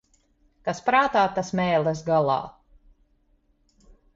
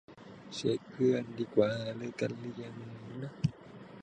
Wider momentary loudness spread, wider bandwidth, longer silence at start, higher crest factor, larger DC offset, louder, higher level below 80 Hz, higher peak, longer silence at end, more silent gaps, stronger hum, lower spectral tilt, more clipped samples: second, 11 LU vs 18 LU; second, 7.8 kHz vs 9.6 kHz; first, 0.65 s vs 0.1 s; about the same, 18 dB vs 22 dB; neither; first, -23 LUFS vs -34 LUFS; first, -58 dBFS vs -68 dBFS; first, -8 dBFS vs -12 dBFS; first, 1.65 s vs 0 s; neither; neither; about the same, -5.5 dB/octave vs -6.5 dB/octave; neither